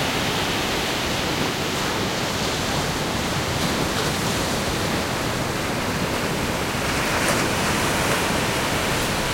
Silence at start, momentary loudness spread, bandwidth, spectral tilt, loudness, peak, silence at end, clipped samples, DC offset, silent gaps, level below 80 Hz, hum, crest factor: 0 s; 3 LU; 16.5 kHz; -3.5 dB/octave; -22 LUFS; -8 dBFS; 0 s; under 0.1%; under 0.1%; none; -38 dBFS; none; 16 dB